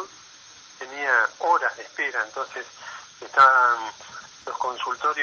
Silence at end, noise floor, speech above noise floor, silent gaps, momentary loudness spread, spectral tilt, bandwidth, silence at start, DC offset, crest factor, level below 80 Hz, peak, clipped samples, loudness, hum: 0 s; -48 dBFS; 25 dB; none; 23 LU; -1 dB/octave; 7.6 kHz; 0 s; under 0.1%; 20 dB; -76 dBFS; -4 dBFS; under 0.1%; -22 LUFS; none